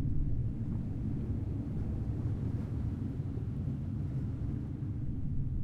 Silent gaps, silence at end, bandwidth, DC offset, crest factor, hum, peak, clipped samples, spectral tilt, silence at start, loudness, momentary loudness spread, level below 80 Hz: none; 0 s; 4.7 kHz; under 0.1%; 12 dB; none; -22 dBFS; under 0.1%; -10.5 dB/octave; 0 s; -37 LUFS; 2 LU; -40 dBFS